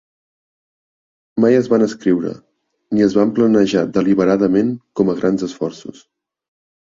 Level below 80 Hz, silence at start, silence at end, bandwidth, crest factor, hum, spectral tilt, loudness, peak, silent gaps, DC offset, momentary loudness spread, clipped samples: -56 dBFS; 1.35 s; 0.95 s; 7.6 kHz; 16 dB; none; -7 dB/octave; -16 LUFS; -2 dBFS; none; under 0.1%; 12 LU; under 0.1%